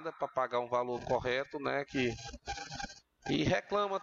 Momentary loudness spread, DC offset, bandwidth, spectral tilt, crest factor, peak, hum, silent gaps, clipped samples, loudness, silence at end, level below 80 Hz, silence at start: 11 LU; under 0.1%; 7.8 kHz; -5 dB/octave; 16 dB; -20 dBFS; none; none; under 0.1%; -35 LUFS; 0 s; -56 dBFS; 0 s